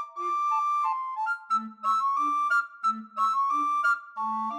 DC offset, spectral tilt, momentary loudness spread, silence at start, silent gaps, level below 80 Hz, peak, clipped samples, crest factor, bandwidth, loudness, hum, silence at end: under 0.1%; -2.5 dB/octave; 6 LU; 0 s; none; under -90 dBFS; -16 dBFS; under 0.1%; 12 dB; 12.5 kHz; -27 LUFS; none; 0 s